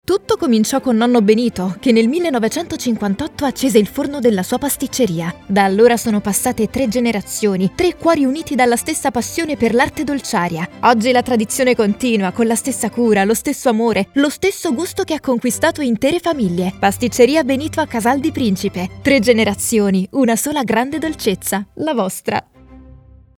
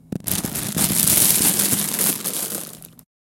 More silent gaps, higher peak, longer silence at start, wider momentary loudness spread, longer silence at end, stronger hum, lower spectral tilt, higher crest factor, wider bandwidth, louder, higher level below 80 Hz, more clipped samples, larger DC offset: neither; about the same, 0 dBFS vs 0 dBFS; about the same, 0.1 s vs 0.1 s; second, 7 LU vs 12 LU; about the same, 0.45 s vs 0.35 s; neither; first, -4.5 dB/octave vs -2 dB/octave; second, 16 dB vs 22 dB; about the same, 19 kHz vs 18 kHz; about the same, -16 LUFS vs -17 LUFS; about the same, -46 dBFS vs -50 dBFS; neither; neither